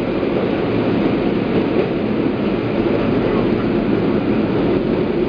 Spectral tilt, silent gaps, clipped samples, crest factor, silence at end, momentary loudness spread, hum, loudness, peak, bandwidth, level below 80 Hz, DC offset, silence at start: -9.5 dB/octave; none; under 0.1%; 14 dB; 0 s; 2 LU; none; -18 LUFS; -4 dBFS; 5.2 kHz; -38 dBFS; under 0.1%; 0 s